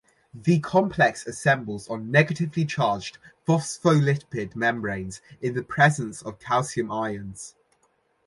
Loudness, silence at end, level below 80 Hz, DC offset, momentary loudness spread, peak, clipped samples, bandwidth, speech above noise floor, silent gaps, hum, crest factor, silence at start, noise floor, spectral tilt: -24 LUFS; 0.8 s; -58 dBFS; under 0.1%; 13 LU; -4 dBFS; under 0.1%; 11.5 kHz; 43 dB; none; none; 20 dB; 0.35 s; -68 dBFS; -6 dB/octave